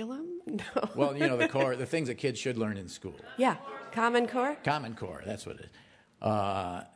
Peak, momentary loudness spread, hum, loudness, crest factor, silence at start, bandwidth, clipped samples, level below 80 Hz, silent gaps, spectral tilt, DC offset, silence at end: -12 dBFS; 13 LU; none; -31 LUFS; 20 dB; 0 s; 11 kHz; under 0.1%; -66 dBFS; none; -5.5 dB/octave; under 0.1%; 0.1 s